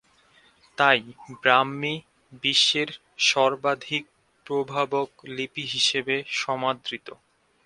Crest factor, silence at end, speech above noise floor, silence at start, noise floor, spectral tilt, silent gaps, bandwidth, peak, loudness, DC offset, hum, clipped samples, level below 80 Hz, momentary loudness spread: 24 dB; 0.55 s; 34 dB; 0.8 s; -59 dBFS; -2.5 dB/octave; none; 11.5 kHz; -2 dBFS; -24 LUFS; under 0.1%; none; under 0.1%; -70 dBFS; 13 LU